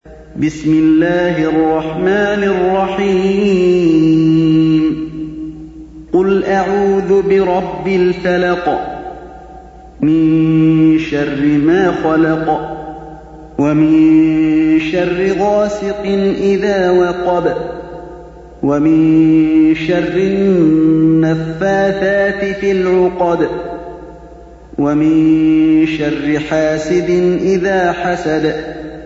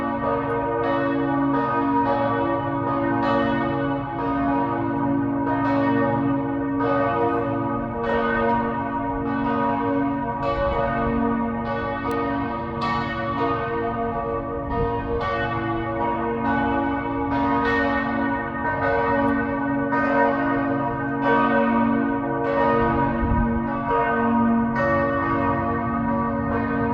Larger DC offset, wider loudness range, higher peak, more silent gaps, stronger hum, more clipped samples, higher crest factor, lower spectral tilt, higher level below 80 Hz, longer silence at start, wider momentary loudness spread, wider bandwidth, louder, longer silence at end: neither; about the same, 3 LU vs 4 LU; first, -2 dBFS vs -6 dBFS; neither; neither; neither; second, 10 dB vs 16 dB; second, -7.5 dB/octave vs -9 dB/octave; about the same, -40 dBFS vs -40 dBFS; about the same, 0.05 s vs 0 s; first, 14 LU vs 5 LU; first, 7.6 kHz vs 6 kHz; first, -13 LUFS vs -23 LUFS; about the same, 0 s vs 0 s